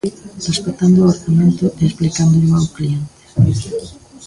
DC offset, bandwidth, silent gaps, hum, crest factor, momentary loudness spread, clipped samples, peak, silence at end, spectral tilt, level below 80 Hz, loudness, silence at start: under 0.1%; 11.5 kHz; none; none; 14 dB; 13 LU; under 0.1%; -2 dBFS; 0 s; -7 dB/octave; -38 dBFS; -15 LUFS; 0.05 s